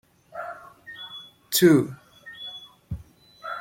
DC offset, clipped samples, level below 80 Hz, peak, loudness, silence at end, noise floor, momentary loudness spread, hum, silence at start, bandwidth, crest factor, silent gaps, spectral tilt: under 0.1%; under 0.1%; -54 dBFS; -4 dBFS; -21 LUFS; 0 s; -47 dBFS; 24 LU; none; 0.35 s; 16.5 kHz; 22 dB; none; -4.5 dB/octave